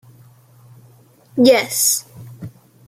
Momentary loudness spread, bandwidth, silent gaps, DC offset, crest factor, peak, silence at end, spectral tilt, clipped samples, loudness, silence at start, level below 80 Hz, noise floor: 24 LU; 16 kHz; none; under 0.1%; 18 dB; -2 dBFS; 0.4 s; -2.5 dB/octave; under 0.1%; -15 LUFS; 1.35 s; -64 dBFS; -49 dBFS